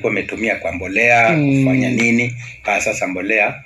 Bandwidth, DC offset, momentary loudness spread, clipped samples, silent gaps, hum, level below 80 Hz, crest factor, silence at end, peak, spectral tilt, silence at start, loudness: 12.5 kHz; under 0.1%; 9 LU; under 0.1%; none; none; -48 dBFS; 16 dB; 0 s; 0 dBFS; -5.5 dB/octave; 0 s; -16 LUFS